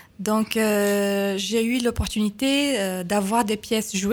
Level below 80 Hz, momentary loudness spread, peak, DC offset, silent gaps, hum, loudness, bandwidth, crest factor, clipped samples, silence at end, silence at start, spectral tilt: -42 dBFS; 4 LU; -4 dBFS; under 0.1%; none; none; -23 LUFS; 19.5 kHz; 18 dB; under 0.1%; 0 s; 0.2 s; -4 dB/octave